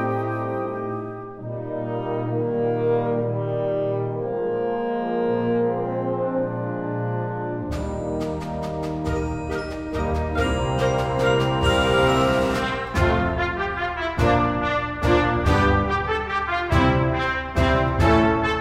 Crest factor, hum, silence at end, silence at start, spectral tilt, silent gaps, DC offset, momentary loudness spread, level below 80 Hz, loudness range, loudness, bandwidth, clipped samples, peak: 16 dB; none; 0 s; 0 s; -6.5 dB/octave; none; under 0.1%; 9 LU; -34 dBFS; 6 LU; -23 LUFS; 15 kHz; under 0.1%; -6 dBFS